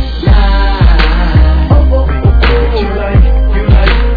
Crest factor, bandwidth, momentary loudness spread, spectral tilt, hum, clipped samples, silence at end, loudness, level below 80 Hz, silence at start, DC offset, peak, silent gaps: 6 dB; 5 kHz; 3 LU; -9 dB/octave; none; 0.5%; 0 s; -10 LUFS; -8 dBFS; 0 s; under 0.1%; 0 dBFS; none